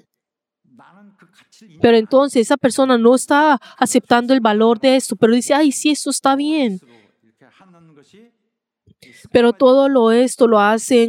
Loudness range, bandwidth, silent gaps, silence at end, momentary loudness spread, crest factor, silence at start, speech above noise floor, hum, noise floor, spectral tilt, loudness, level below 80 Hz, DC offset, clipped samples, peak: 8 LU; 16 kHz; none; 0 s; 5 LU; 16 dB; 1.8 s; 66 dB; none; -80 dBFS; -4 dB/octave; -14 LUFS; -62 dBFS; under 0.1%; under 0.1%; 0 dBFS